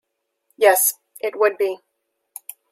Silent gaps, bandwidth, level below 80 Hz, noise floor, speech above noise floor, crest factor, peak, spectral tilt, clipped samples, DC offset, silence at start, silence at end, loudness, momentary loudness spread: none; 16.5 kHz; -82 dBFS; -70 dBFS; 52 dB; 20 dB; -2 dBFS; 0 dB/octave; under 0.1%; under 0.1%; 0.6 s; 0.95 s; -19 LUFS; 22 LU